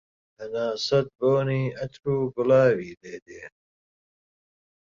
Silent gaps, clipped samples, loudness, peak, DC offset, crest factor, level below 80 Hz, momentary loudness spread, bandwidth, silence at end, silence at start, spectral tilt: 2.97-3.01 s, 3.22-3.26 s; under 0.1%; -24 LUFS; -8 dBFS; under 0.1%; 18 dB; -62 dBFS; 22 LU; 7.6 kHz; 1.45 s; 0.4 s; -6.5 dB/octave